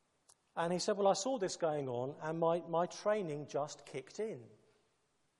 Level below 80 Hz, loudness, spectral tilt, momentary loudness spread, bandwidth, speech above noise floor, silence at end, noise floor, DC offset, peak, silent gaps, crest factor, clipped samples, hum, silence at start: -84 dBFS; -37 LUFS; -4.5 dB/octave; 11 LU; 11.5 kHz; 41 dB; 0.9 s; -78 dBFS; under 0.1%; -18 dBFS; none; 20 dB; under 0.1%; none; 0.55 s